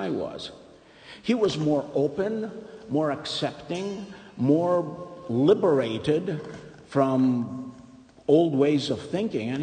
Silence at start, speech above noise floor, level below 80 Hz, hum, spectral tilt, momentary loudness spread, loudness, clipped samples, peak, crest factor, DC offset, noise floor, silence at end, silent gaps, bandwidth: 0 s; 25 dB; -62 dBFS; none; -7 dB/octave; 17 LU; -25 LUFS; under 0.1%; -8 dBFS; 18 dB; under 0.1%; -50 dBFS; 0 s; none; 9.6 kHz